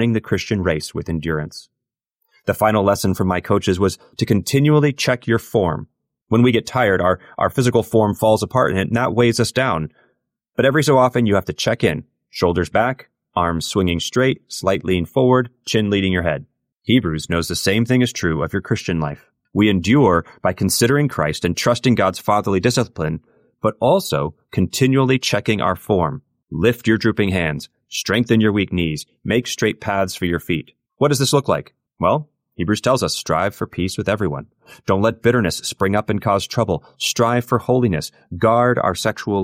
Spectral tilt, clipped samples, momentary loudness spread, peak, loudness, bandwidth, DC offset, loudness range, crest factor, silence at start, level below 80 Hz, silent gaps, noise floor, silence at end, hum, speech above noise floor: -5.5 dB/octave; under 0.1%; 9 LU; -4 dBFS; -18 LUFS; 16 kHz; under 0.1%; 3 LU; 16 dB; 0 s; -44 dBFS; none; -77 dBFS; 0 s; none; 59 dB